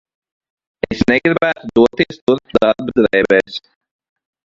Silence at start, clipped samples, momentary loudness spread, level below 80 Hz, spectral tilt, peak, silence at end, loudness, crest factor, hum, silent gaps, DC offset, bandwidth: 0.9 s; under 0.1%; 11 LU; -44 dBFS; -6.5 dB/octave; 0 dBFS; 0.9 s; -15 LUFS; 16 dB; none; 2.22-2.27 s; under 0.1%; 7.6 kHz